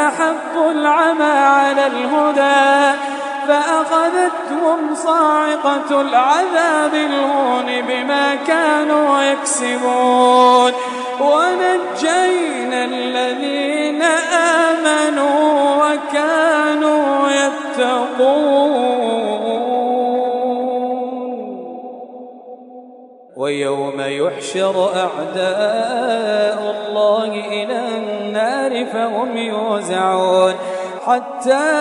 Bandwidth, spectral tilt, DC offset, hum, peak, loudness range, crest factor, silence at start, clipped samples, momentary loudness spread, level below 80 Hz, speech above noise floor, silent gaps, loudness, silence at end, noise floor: 11 kHz; -3 dB/octave; under 0.1%; none; 0 dBFS; 7 LU; 16 dB; 0 s; under 0.1%; 8 LU; -72 dBFS; 26 dB; none; -16 LUFS; 0 s; -41 dBFS